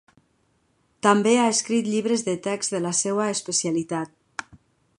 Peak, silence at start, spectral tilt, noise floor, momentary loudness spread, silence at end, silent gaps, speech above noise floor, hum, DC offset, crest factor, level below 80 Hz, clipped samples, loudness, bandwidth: -4 dBFS; 1.05 s; -3.5 dB/octave; -67 dBFS; 13 LU; 0.55 s; none; 44 dB; none; under 0.1%; 20 dB; -68 dBFS; under 0.1%; -23 LUFS; 11.5 kHz